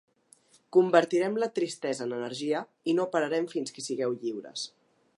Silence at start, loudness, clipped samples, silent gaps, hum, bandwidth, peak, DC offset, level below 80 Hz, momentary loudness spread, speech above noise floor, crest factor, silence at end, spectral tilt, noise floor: 0.75 s; -29 LUFS; under 0.1%; none; none; 11.5 kHz; -6 dBFS; under 0.1%; -84 dBFS; 12 LU; 34 dB; 22 dB; 0.5 s; -4.5 dB/octave; -62 dBFS